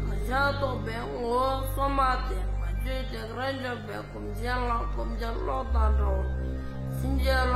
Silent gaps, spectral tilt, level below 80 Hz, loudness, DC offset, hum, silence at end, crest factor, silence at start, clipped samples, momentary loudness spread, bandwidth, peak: none; -6.5 dB/octave; -30 dBFS; -30 LUFS; under 0.1%; none; 0 s; 16 dB; 0 s; under 0.1%; 9 LU; 14.5 kHz; -12 dBFS